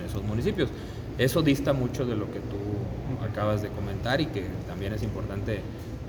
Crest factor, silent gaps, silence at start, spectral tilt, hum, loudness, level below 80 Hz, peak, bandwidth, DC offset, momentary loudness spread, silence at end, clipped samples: 18 dB; none; 0 s; -6.5 dB/octave; none; -29 LUFS; -42 dBFS; -10 dBFS; over 20 kHz; under 0.1%; 10 LU; 0 s; under 0.1%